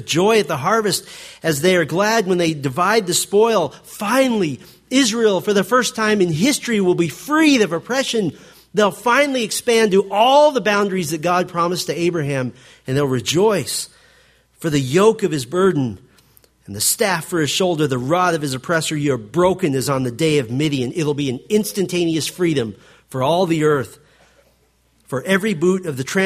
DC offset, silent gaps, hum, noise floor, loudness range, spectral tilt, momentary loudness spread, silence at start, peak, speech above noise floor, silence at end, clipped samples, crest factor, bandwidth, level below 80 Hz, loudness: under 0.1%; none; none; -59 dBFS; 4 LU; -4.5 dB/octave; 8 LU; 0 s; -2 dBFS; 41 dB; 0 s; under 0.1%; 16 dB; 15.5 kHz; -56 dBFS; -18 LUFS